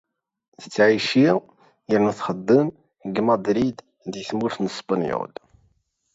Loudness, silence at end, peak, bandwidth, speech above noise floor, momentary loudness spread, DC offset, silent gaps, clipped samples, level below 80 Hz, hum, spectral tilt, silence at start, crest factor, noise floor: -22 LUFS; 0.9 s; -4 dBFS; 8 kHz; 45 dB; 14 LU; under 0.1%; none; under 0.1%; -60 dBFS; none; -6 dB/octave; 0.6 s; 18 dB; -66 dBFS